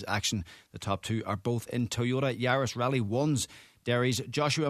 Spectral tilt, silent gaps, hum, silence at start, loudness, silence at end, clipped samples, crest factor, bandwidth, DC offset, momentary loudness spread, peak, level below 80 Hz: -5 dB/octave; none; none; 0 s; -30 LUFS; 0 s; under 0.1%; 18 dB; 14 kHz; under 0.1%; 9 LU; -14 dBFS; -60 dBFS